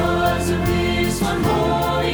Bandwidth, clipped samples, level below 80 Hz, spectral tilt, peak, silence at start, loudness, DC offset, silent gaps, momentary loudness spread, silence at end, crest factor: over 20 kHz; under 0.1%; -32 dBFS; -5.5 dB/octave; -6 dBFS; 0 s; -19 LUFS; under 0.1%; none; 2 LU; 0 s; 12 dB